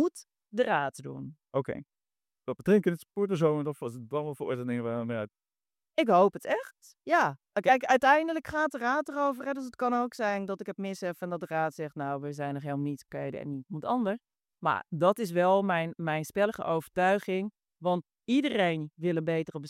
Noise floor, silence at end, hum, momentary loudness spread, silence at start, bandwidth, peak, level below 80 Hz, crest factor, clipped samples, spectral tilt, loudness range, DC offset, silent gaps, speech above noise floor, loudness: under -90 dBFS; 0 s; none; 12 LU; 0 s; 15.5 kHz; -10 dBFS; -72 dBFS; 20 dB; under 0.1%; -6 dB/octave; 7 LU; under 0.1%; none; over 61 dB; -30 LUFS